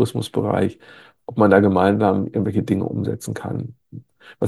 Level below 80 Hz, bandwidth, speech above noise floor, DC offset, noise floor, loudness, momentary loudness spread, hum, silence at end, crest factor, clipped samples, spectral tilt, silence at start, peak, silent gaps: -56 dBFS; 12.5 kHz; 22 dB; under 0.1%; -41 dBFS; -20 LUFS; 15 LU; none; 0 s; 20 dB; under 0.1%; -7.5 dB/octave; 0 s; 0 dBFS; none